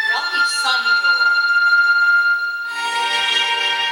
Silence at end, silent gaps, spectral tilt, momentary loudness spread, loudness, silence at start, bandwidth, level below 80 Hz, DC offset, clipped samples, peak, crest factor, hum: 0 s; none; 2.5 dB/octave; 7 LU; -15 LUFS; 0 s; 17 kHz; -66 dBFS; under 0.1%; under 0.1%; -4 dBFS; 12 dB; none